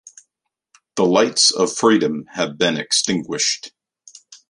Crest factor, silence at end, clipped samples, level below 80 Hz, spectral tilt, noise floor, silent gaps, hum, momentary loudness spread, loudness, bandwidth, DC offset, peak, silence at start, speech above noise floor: 18 dB; 0.15 s; under 0.1%; -64 dBFS; -2.5 dB/octave; -77 dBFS; none; none; 11 LU; -17 LUFS; 11.5 kHz; under 0.1%; -2 dBFS; 0.05 s; 59 dB